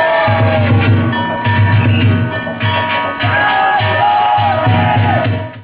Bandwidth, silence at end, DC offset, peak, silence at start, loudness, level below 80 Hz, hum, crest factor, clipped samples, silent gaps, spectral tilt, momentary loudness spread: 4 kHz; 0 s; under 0.1%; -2 dBFS; 0 s; -12 LUFS; -32 dBFS; none; 10 dB; under 0.1%; none; -10.5 dB/octave; 4 LU